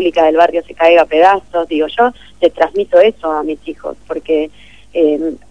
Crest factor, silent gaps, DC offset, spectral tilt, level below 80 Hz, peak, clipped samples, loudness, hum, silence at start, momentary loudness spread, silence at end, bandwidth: 12 dB; none; 0.9%; -5 dB/octave; -46 dBFS; 0 dBFS; 0.4%; -13 LUFS; none; 0 s; 14 LU; 0.15 s; 9.6 kHz